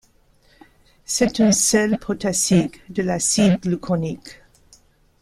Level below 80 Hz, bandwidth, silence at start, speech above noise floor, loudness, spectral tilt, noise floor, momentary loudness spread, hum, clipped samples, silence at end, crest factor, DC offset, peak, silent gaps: -50 dBFS; 15 kHz; 1.1 s; 37 dB; -19 LUFS; -4 dB/octave; -57 dBFS; 10 LU; none; under 0.1%; 0.9 s; 18 dB; under 0.1%; -4 dBFS; none